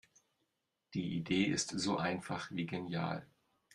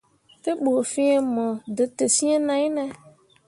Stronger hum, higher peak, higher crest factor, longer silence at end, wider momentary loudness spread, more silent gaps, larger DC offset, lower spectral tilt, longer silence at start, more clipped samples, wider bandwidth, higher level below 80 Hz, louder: neither; second, -20 dBFS vs -8 dBFS; about the same, 20 dB vs 16 dB; about the same, 0.5 s vs 0.4 s; about the same, 8 LU vs 10 LU; neither; neither; first, -4.5 dB/octave vs -3 dB/octave; first, 0.9 s vs 0.45 s; neither; about the same, 11.5 kHz vs 11.5 kHz; about the same, -70 dBFS vs -70 dBFS; second, -37 LUFS vs -23 LUFS